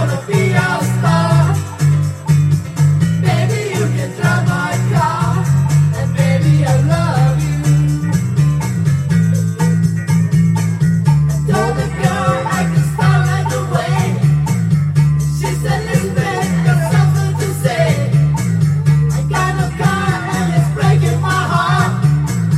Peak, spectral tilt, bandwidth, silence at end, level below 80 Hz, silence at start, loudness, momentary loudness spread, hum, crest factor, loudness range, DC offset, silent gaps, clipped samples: 0 dBFS; -6.5 dB/octave; 14 kHz; 0 s; -36 dBFS; 0 s; -14 LUFS; 4 LU; none; 12 dB; 1 LU; under 0.1%; none; under 0.1%